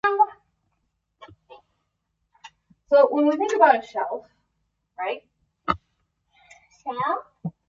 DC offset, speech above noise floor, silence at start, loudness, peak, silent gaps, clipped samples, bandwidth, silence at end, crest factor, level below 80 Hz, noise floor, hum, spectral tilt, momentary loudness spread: under 0.1%; 55 dB; 0.05 s; -22 LUFS; -2 dBFS; none; under 0.1%; 7.6 kHz; 0.2 s; 22 dB; -60 dBFS; -76 dBFS; none; -5.5 dB/octave; 18 LU